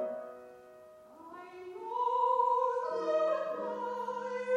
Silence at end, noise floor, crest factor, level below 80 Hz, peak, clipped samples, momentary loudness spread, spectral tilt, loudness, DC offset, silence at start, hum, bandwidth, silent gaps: 0 s; -55 dBFS; 16 dB; -84 dBFS; -18 dBFS; under 0.1%; 22 LU; -4.5 dB/octave; -33 LUFS; under 0.1%; 0 s; none; 10 kHz; none